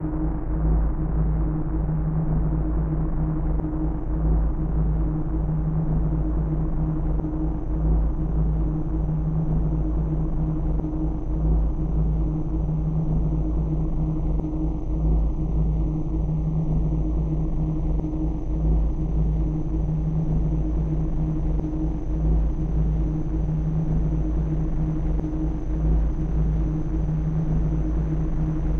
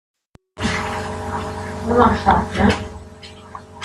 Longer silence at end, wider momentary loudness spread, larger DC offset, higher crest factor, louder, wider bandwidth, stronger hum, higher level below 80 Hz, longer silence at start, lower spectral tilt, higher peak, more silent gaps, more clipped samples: about the same, 0 s vs 0 s; second, 3 LU vs 23 LU; neither; second, 12 dB vs 20 dB; second, -26 LUFS vs -19 LUFS; second, 2.5 kHz vs 12.5 kHz; neither; first, -24 dBFS vs -36 dBFS; second, 0 s vs 0.55 s; first, -11.5 dB/octave vs -6 dB/octave; second, -12 dBFS vs 0 dBFS; neither; neither